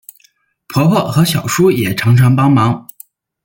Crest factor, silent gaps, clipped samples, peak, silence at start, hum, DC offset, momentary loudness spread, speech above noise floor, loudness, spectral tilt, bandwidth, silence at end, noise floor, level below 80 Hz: 12 dB; none; under 0.1%; -2 dBFS; 0.7 s; none; under 0.1%; 6 LU; 44 dB; -12 LUFS; -6 dB/octave; 17 kHz; 0.65 s; -55 dBFS; -48 dBFS